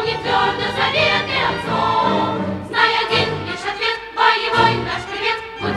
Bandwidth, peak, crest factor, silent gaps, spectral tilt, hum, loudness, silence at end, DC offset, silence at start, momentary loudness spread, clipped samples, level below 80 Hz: 12.5 kHz; -2 dBFS; 18 dB; none; -4.5 dB/octave; none; -18 LUFS; 0 s; under 0.1%; 0 s; 7 LU; under 0.1%; -46 dBFS